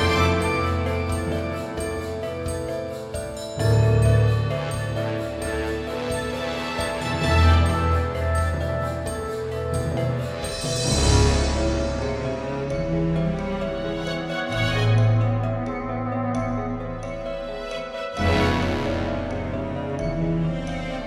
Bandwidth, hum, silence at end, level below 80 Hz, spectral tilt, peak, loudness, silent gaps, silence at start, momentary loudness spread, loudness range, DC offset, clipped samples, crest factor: 15 kHz; none; 0 s; -32 dBFS; -5.5 dB/octave; -6 dBFS; -24 LUFS; none; 0 s; 10 LU; 3 LU; under 0.1%; under 0.1%; 18 dB